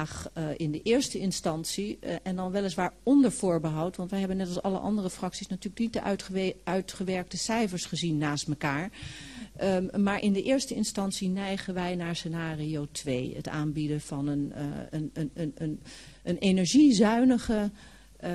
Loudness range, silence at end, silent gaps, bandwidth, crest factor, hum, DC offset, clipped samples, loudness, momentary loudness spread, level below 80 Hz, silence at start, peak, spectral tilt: 6 LU; 0 s; none; 13 kHz; 18 dB; none; under 0.1%; under 0.1%; -29 LUFS; 12 LU; -54 dBFS; 0 s; -12 dBFS; -5.5 dB/octave